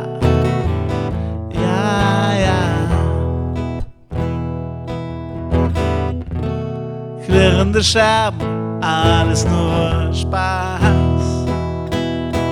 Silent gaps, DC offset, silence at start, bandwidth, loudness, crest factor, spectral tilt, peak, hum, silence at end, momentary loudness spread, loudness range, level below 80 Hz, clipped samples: none; under 0.1%; 0 s; 11.5 kHz; -17 LUFS; 16 dB; -6 dB/octave; -2 dBFS; none; 0 s; 12 LU; 7 LU; -30 dBFS; under 0.1%